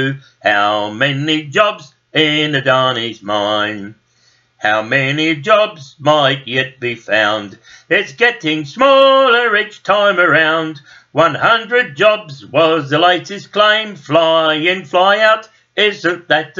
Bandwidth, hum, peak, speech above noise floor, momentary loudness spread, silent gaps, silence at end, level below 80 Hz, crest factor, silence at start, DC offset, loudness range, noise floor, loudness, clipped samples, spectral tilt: 7.6 kHz; none; 0 dBFS; 41 dB; 9 LU; none; 0.15 s; -62 dBFS; 14 dB; 0 s; under 0.1%; 4 LU; -55 dBFS; -13 LUFS; under 0.1%; -4.5 dB/octave